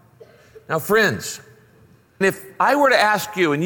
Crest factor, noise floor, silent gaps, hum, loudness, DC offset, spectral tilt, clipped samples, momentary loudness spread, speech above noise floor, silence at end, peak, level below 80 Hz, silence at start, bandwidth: 18 dB; -53 dBFS; none; none; -18 LUFS; under 0.1%; -4 dB/octave; under 0.1%; 13 LU; 34 dB; 0 s; -4 dBFS; -60 dBFS; 0.7 s; 17 kHz